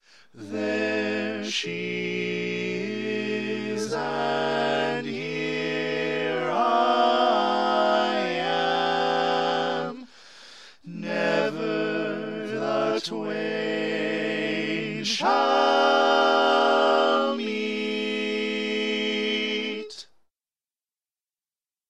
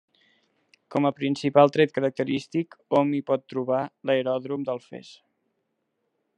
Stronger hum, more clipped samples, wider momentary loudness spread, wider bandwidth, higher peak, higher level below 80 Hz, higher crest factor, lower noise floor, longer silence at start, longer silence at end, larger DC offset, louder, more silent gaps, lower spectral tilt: neither; neither; about the same, 10 LU vs 11 LU; first, 11.5 kHz vs 9.4 kHz; second, -8 dBFS vs -4 dBFS; about the same, -78 dBFS vs -76 dBFS; about the same, 18 dB vs 22 dB; first, under -90 dBFS vs -77 dBFS; second, 0.35 s vs 0.9 s; first, 1.85 s vs 1.25 s; first, 0.2% vs under 0.1%; about the same, -25 LUFS vs -25 LUFS; neither; second, -4 dB/octave vs -7 dB/octave